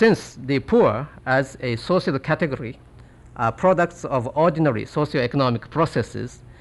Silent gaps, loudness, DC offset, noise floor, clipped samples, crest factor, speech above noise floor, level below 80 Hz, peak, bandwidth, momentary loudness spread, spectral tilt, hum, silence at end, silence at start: none; -22 LUFS; under 0.1%; -46 dBFS; under 0.1%; 14 dB; 25 dB; -48 dBFS; -6 dBFS; 12 kHz; 10 LU; -7 dB/octave; none; 0.1 s; 0 s